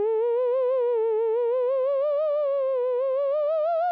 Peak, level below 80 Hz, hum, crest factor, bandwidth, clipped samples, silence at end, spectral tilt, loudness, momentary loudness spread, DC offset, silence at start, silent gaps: -20 dBFS; -86 dBFS; 60 Hz at -80 dBFS; 4 dB; 4.6 kHz; under 0.1%; 0 s; -5 dB/octave; -24 LUFS; 1 LU; under 0.1%; 0 s; none